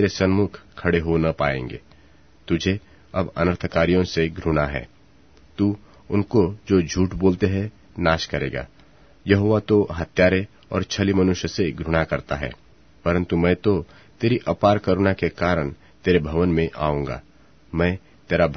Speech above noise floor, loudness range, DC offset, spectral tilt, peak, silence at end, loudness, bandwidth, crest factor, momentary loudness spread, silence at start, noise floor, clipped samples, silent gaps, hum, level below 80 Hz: 33 dB; 2 LU; 0.2%; -6.5 dB/octave; -2 dBFS; 0 s; -22 LUFS; 6.6 kHz; 20 dB; 11 LU; 0 s; -53 dBFS; under 0.1%; none; none; -40 dBFS